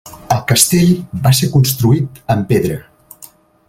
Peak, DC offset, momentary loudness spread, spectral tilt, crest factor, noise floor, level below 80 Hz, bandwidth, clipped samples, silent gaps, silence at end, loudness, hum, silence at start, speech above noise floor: 0 dBFS; under 0.1%; 8 LU; -5 dB/octave; 14 dB; -42 dBFS; -42 dBFS; 17 kHz; under 0.1%; none; 0.85 s; -13 LUFS; none; 0.05 s; 29 dB